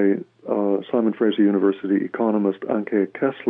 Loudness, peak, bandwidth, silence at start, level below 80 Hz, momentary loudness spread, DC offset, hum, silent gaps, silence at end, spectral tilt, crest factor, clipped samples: -22 LUFS; -8 dBFS; 3.8 kHz; 0 s; -80 dBFS; 6 LU; under 0.1%; none; none; 0 s; -10 dB/octave; 12 dB; under 0.1%